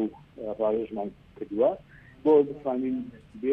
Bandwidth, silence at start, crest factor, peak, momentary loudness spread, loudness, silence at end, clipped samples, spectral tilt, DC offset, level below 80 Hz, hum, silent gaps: 3.9 kHz; 0 s; 18 dB; -10 dBFS; 17 LU; -27 LUFS; 0 s; under 0.1%; -9.5 dB/octave; under 0.1%; -60 dBFS; none; none